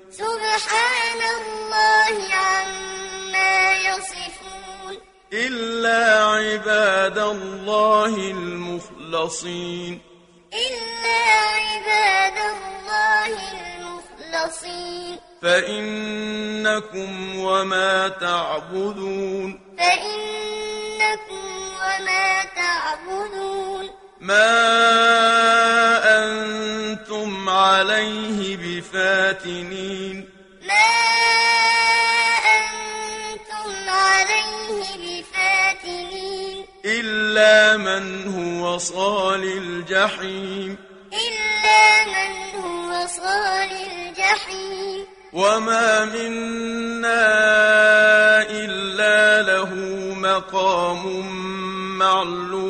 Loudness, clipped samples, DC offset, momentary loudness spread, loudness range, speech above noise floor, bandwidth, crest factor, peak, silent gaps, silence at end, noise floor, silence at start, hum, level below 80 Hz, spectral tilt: -19 LUFS; under 0.1%; under 0.1%; 16 LU; 7 LU; 24 dB; 11 kHz; 18 dB; -2 dBFS; none; 0 s; -44 dBFS; 0.1 s; none; -56 dBFS; -2 dB/octave